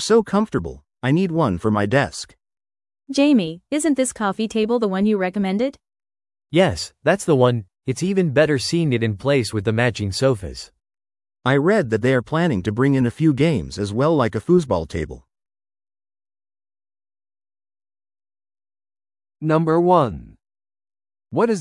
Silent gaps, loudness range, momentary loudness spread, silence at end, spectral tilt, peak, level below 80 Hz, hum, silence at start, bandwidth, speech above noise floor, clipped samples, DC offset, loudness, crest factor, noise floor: none; 4 LU; 10 LU; 0 s; -6 dB/octave; -2 dBFS; -50 dBFS; none; 0 s; 12 kHz; over 71 dB; under 0.1%; under 0.1%; -20 LUFS; 18 dB; under -90 dBFS